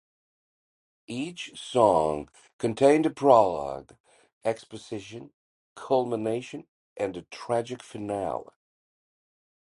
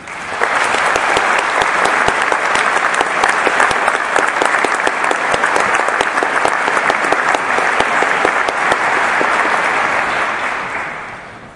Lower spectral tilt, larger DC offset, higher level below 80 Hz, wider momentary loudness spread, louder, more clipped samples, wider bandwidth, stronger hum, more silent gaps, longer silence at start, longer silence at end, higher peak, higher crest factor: first, -5.5 dB/octave vs -2 dB/octave; neither; second, -62 dBFS vs -48 dBFS; first, 19 LU vs 4 LU; second, -26 LUFS vs -14 LUFS; neither; about the same, 11.5 kHz vs 11.5 kHz; neither; first, 2.53-2.59 s, 4.00-4.04 s, 4.33-4.41 s, 5.34-5.76 s, 6.68-6.96 s vs none; first, 1.1 s vs 0 s; first, 1.35 s vs 0 s; second, -4 dBFS vs 0 dBFS; first, 24 dB vs 14 dB